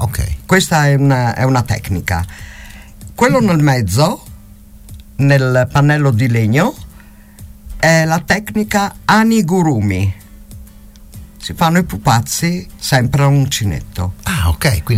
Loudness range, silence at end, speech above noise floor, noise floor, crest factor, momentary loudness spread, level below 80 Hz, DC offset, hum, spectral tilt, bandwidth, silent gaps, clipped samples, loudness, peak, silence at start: 2 LU; 0 s; 26 dB; -39 dBFS; 14 dB; 12 LU; -32 dBFS; under 0.1%; none; -5.5 dB/octave; 16 kHz; none; under 0.1%; -14 LUFS; -2 dBFS; 0 s